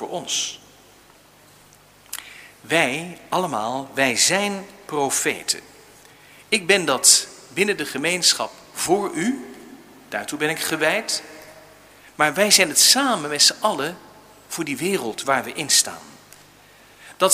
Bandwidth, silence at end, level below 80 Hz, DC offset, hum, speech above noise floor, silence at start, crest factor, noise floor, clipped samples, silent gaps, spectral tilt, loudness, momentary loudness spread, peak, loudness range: 16 kHz; 0 s; -64 dBFS; under 0.1%; 50 Hz at -60 dBFS; 30 dB; 0 s; 22 dB; -51 dBFS; under 0.1%; none; -1 dB/octave; -19 LUFS; 17 LU; 0 dBFS; 7 LU